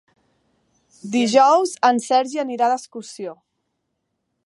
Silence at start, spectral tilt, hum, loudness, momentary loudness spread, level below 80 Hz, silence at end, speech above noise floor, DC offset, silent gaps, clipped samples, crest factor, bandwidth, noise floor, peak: 1.05 s; -3.5 dB/octave; none; -18 LUFS; 20 LU; -78 dBFS; 1.1 s; 56 dB; under 0.1%; none; under 0.1%; 20 dB; 11.5 kHz; -75 dBFS; -2 dBFS